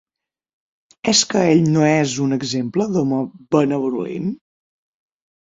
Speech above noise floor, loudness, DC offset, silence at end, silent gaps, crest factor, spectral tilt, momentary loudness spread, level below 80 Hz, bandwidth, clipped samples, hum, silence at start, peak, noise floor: 69 dB; -18 LUFS; under 0.1%; 1.15 s; none; 18 dB; -4.5 dB/octave; 10 LU; -58 dBFS; 7.8 kHz; under 0.1%; none; 1.05 s; -2 dBFS; -86 dBFS